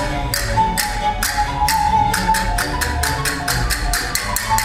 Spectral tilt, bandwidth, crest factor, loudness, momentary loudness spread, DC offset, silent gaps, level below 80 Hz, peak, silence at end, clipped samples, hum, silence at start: -2.5 dB/octave; 17 kHz; 18 dB; -18 LUFS; 4 LU; under 0.1%; none; -26 dBFS; 0 dBFS; 0 s; under 0.1%; none; 0 s